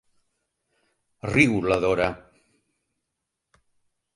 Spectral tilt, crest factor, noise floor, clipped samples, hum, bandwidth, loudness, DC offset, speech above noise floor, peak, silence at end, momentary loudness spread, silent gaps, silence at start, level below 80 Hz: -6 dB/octave; 24 dB; -82 dBFS; under 0.1%; none; 11.5 kHz; -22 LUFS; under 0.1%; 60 dB; -4 dBFS; 2 s; 15 LU; none; 1.25 s; -52 dBFS